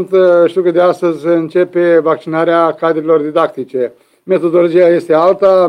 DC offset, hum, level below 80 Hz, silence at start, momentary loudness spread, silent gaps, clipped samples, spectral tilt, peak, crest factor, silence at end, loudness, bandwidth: under 0.1%; none; -62 dBFS; 0 s; 7 LU; none; under 0.1%; -7.5 dB/octave; 0 dBFS; 10 dB; 0 s; -12 LUFS; 10 kHz